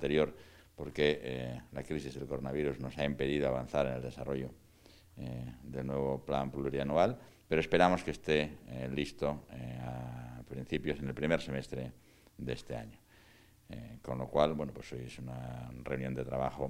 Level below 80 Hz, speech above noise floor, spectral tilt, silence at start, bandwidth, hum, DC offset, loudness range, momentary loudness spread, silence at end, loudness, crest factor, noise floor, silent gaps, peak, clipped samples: -54 dBFS; 27 dB; -6.5 dB/octave; 0 s; 16 kHz; none; under 0.1%; 6 LU; 14 LU; 0 s; -36 LUFS; 26 dB; -62 dBFS; none; -10 dBFS; under 0.1%